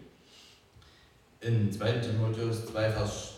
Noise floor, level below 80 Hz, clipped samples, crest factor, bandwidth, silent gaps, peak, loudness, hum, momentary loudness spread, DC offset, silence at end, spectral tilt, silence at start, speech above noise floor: -60 dBFS; -54 dBFS; under 0.1%; 18 dB; 13 kHz; none; -16 dBFS; -31 LUFS; none; 4 LU; under 0.1%; 0 s; -6 dB/octave; 0 s; 30 dB